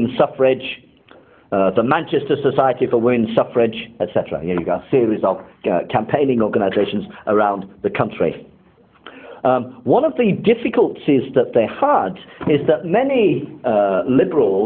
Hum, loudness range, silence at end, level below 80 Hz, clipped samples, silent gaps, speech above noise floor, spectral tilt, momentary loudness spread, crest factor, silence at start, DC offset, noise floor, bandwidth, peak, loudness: none; 3 LU; 0 s; -52 dBFS; under 0.1%; none; 34 dB; -11 dB/octave; 6 LU; 18 dB; 0 s; under 0.1%; -51 dBFS; 4.3 kHz; 0 dBFS; -18 LUFS